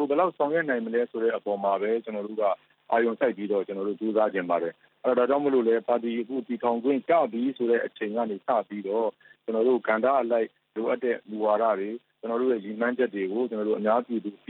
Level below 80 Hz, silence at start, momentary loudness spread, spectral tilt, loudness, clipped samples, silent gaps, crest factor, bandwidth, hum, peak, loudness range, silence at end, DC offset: -86 dBFS; 0 s; 8 LU; -10 dB/octave; -27 LUFS; under 0.1%; none; 16 dB; 4.2 kHz; none; -10 dBFS; 2 LU; 0.15 s; under 0.1%